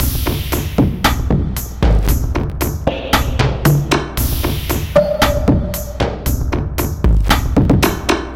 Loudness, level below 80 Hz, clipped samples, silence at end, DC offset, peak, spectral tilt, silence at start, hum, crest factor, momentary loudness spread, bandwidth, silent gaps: -16 LUFS; -20 dBFS; under 0.1%; 0 s; under 0.1%; 0 dBFS; -5.5 dB/octave; 0 s; none; 16 dB; 6 LU; 17 kHz; none